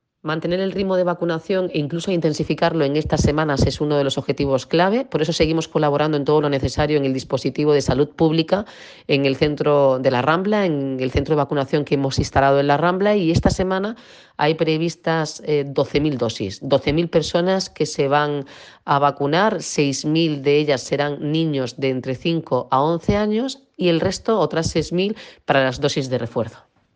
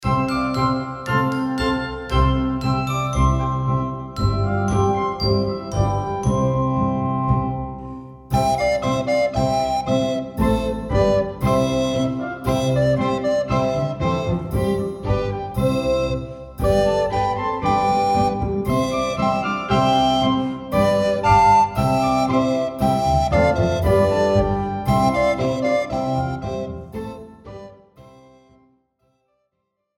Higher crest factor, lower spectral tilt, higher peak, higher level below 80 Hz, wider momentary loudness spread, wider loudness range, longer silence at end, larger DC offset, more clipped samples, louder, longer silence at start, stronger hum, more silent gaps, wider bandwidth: about the same, 16 dB vs 18 dB; about the same, -5.5 dB/octave vs -6.5 dB/octave; about the same, -4 dBFS vs -2 dBFS; second, -40 dBFS vs -32 dBFS; about the same, 6 LU vs 7 LU; second, 2 LU vs 5 LU; second, 0.4 s vs 1.95 s; neither; neither; about the same, -20 LUFS vs -20 LUFS; first, 0.25 s vs 0 s; neither; neither; second, 9.8 kHz vs 16.5 kHz